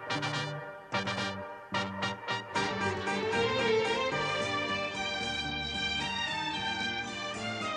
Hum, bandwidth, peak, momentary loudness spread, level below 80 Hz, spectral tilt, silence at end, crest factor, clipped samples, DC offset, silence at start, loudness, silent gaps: none; 11 kHz; -18 dBFS; 7 LU; -58 dBFS; -3.5 dB/octave; 0 s; 16 dB; under 0.1%; under 0.1%; 0 s; -32 LUFS; none